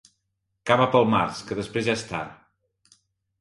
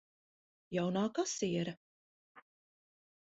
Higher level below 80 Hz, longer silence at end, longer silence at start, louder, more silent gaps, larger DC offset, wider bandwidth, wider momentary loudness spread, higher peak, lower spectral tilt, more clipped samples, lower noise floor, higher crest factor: first, -58 dBFS vs -76 dBFS; about the same, 1.05 s vs 0.95 s; about the same, 0.65 s vs 0.7 s; first, -23 LUFS vs -36 LUFS; second, none vs 1.77-2.35 s; neither; first, 11.5 kHz vs 7.6 kHz; first, 14 LU vs 8 LU; first, -4 dBFS vs -22 dBFS; about the same, -5.5 dB/octave vs -5.5 dB/octave; neither; second, -77 dBFS vs under -90 dBFS; about the same, 22 dB vs 18 dB